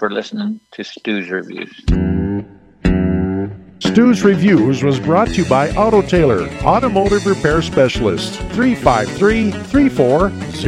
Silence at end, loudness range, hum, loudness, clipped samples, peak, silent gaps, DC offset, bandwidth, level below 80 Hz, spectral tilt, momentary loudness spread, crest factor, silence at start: 0 s; 6 LU; none; -15 LUFS; under 0.1%; 0 dBFS; none; under 0.1%; 12 kHz; -30 dBFS; -6.5 dB/octave; 11 LU; 14 dB; 0 s